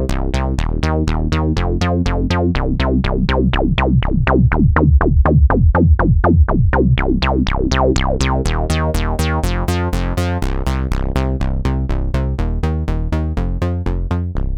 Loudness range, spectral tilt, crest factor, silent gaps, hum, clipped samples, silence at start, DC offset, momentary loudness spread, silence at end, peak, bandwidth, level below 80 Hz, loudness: 6 LU; -7 dB/octave; 14 dB; none; none; under 0.1%; 0 s; under 0.1%; 7 LU; 0 s; 0 dBFS; 13.5 kHz; -18 dBFS; -17 LUFS